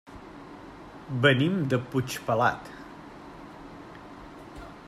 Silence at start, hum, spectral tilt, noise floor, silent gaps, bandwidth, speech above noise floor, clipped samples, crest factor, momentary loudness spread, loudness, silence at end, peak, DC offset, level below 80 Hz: 0.1 s; none; -6 dB/octave; -45 dBFS; none; 15 kHz; 20 dB; under 0.1%; 24 dB; 22 LU; -26 LUFS; 0 s; -6 dBFS; under 0.1%; -56 dBFS